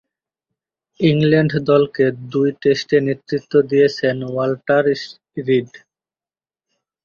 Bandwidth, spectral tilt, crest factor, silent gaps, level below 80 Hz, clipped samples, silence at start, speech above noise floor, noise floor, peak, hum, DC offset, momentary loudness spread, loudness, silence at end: 7 kHz; -7 dB/octave; 16 dB; none; -58 dBFS; under 0.1%; 1 s; over 73 dB; under -90 dBFS; -2 dBFS; none; under 0.1%; 7 LU; -17 LUFS; 1.3 s